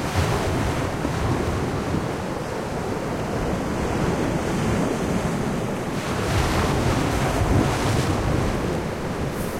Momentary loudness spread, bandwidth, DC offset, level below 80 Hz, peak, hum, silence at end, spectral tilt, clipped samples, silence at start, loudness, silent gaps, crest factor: 6 LU; 16.5 kHz; under 0.1%; -34 dBFS; -8 dBFS; none; 0 s; -6 dB/octave; under 0.1%; 0 s; -24 LUFS; none; 16 dB